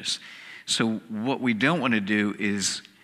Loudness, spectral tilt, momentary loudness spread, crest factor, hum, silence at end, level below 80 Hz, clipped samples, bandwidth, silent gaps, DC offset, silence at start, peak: -25 LUFS; -3.5 dB/octave; 8 LU; 20 dB; none; 0.2 s; -72 dBFS; under 0.1%; 14.5 kHz; none; under 0.1%; 0 s; -6 dBFS